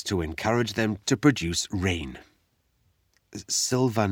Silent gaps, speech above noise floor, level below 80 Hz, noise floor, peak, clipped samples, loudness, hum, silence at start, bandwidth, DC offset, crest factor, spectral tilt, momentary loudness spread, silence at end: none; 44 dB; -48 dBFS; -70 dBFS; -6 dBFS; under 0.1%; -25 LUFS; none; 0 s; 18.5 kHz; under 0.1%; 20 dB; -4.5 dB/octave; 18 LU; 0 s